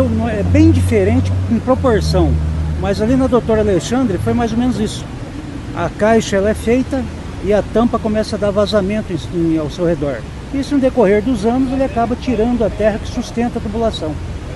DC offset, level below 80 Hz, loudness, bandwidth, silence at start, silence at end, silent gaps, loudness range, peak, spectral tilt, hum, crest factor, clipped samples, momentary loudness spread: under 0.1%; -28 dBFS; -16 LUFS; 12.5 kHz; 0 s; 0 s; none; 3 LU; 0 dBFS; -7 dB/octave; none; 14 dB; under 0.1%; 9 LU